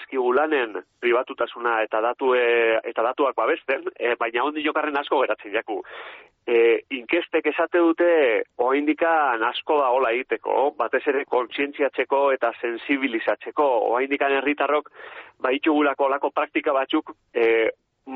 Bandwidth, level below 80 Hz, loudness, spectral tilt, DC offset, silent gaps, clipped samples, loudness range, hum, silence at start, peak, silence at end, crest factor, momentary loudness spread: 4.3 kHz; -70 dBFS; -22 LUFS; 0 dB/octave; under 0.1%; none; under 0.1%; 3 LU; none; 0 s; -8 dBFS; 0 s; 14 dB; 7 LU